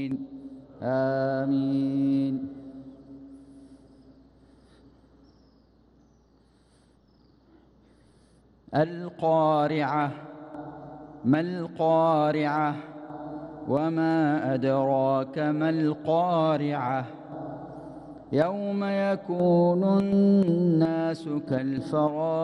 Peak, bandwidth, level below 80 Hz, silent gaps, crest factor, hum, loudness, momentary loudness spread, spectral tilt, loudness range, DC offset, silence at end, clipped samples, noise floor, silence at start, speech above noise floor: -12 dBFS; 10 kHz; -64 dBFS; none; 16 dB; none; -25 LUFS; 20 LU; -9 dB/octave; 7 LU; under 0.1%; 0 s; under 0.1%; -61 dBFS; 0 s; 36 dB